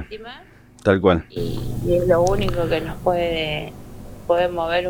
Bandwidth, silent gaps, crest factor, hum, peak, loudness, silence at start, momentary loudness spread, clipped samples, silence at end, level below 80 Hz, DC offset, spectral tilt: 17.5 kHz; none; 18 dB; none; -4 dBFS; -21 LUFS; 0 s; 18 LU; under 0.1%; 0 s; -36 dBFS; under 0.1%; -6 dB/octave